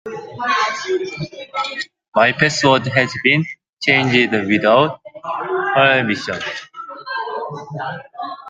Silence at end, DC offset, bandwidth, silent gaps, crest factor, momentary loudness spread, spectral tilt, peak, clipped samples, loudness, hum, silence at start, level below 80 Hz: 0 s; under 0.1%; 9.4 kHz; 2.08-2.12 s, 3.69-3.77 s; 18 dB; 15 LU; -4.5 dB/octave; 0 dBFS; under 0.1%; -17 LUFS; none; 0.05 s; -60 dBFS